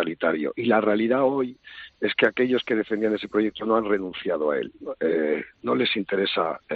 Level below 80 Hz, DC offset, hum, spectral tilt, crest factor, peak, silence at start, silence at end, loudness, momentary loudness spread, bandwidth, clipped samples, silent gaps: -64 dBFS; under 0.1%; none; -3 dB/octave; 18 dB; -6 dBFS; 0 s; 0 s; -24 LUFS; 7 LU; 6 kHz; under 0.1%; none